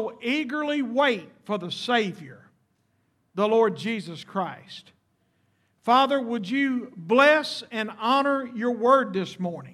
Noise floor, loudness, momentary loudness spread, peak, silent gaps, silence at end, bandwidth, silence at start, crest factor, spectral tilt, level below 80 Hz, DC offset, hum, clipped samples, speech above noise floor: -70 dBFS; -24 LUFS; 13 LU; -6 dBFS; none; 0 s; 13.5 kHz; 0 s; 20 dB; -5 dB/octave; -80 dBFS; under 0.1%; none; under 0.1%; 45 dB